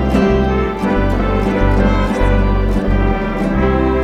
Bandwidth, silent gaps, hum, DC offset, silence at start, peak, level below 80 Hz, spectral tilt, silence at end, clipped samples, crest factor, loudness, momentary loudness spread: 9 kHz; none; none; under 0.1%; 0 s; -2 dBFS; -18 dBFS; -8 dB/octave; 0 s; under 0.1%; 12 dB; -15 LUFS; 3 LU